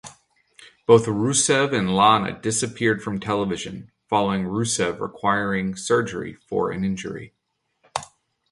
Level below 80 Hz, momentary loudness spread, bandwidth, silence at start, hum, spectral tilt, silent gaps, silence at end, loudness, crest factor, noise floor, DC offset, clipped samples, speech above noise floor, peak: -54 dBFS; 15 LU; 11.5 kHz; 0.05 s; none; -4 dB/octave; none; 0.45 s; -22 LUFS; 20 dB; -66 dBFS; under 0.1%; under 0.1%; 45 dB; -2 dBFS